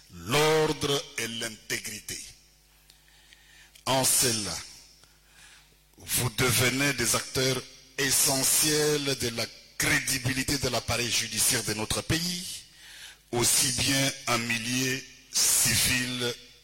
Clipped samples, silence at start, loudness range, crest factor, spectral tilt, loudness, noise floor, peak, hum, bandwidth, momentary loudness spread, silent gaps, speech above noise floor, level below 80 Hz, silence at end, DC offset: under 0.1%; 0.1 s; 5 LU; 18 dB; -2 dB/octave; -25 LUFS; -59 dBFS; -10 dBFS; none; 16.5 kHz; 14 LU; none; 32 dB; -52 dBFS; 0.15 s; under 0.1%